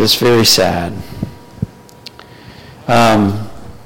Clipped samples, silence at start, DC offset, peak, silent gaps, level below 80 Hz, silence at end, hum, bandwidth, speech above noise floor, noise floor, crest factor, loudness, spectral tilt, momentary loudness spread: under 0.1%; 0 s; under 0.1%; -2 dBFS; none; -40 dBFS; 0 s; none; 17 kHz; 26 dB; -37 dBFS; 14 dB; -11 LUFS; -4 dB/octave; 22 LU